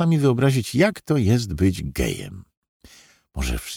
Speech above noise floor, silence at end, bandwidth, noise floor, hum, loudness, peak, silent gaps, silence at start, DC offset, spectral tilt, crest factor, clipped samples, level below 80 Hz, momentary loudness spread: 32 dB; 0 s; 19 kHz; -52 dBFS; none; -21 LUFS; -4 dBFS; 2.57-2.62 s, 2.68-2.80 s; 0 s; under 0.1%; -6 dB/octave; 16 dB; under 0.1%; -36 dBFS; 12 LU